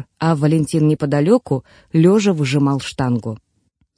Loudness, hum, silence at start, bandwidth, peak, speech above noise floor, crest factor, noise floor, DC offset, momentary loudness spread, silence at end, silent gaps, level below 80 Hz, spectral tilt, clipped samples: -17 LUFS; none; 0 s; 10.5 kHz; -2 dBFS; 48 dB; 14 dB; -64 dBFS; under 0.1%; 10 LU; 0.6 s; none; -52 dBFS; -7 dB/octave; under 0.1%